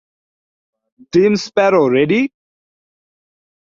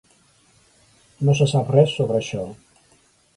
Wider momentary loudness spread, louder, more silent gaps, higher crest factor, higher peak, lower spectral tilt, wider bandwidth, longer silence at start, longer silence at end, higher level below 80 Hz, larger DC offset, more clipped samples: second, 5 LU vs 13 LU; first, -15 LUFS vs -20 LUFS; neither; about the same, 16 dB vs 20 dB; about the same, -2 dBFS vs -4 dBFS; about the same, -6 dB/octave vs -6.5 dB/octave; second, 7.4 kHz vs 11 kHz; about the same, 1.15 s vs 1.2 s; first, 1.35 s vs 0.85 s; about the same, -58 dBFS vs -58 dBFS; neither; neither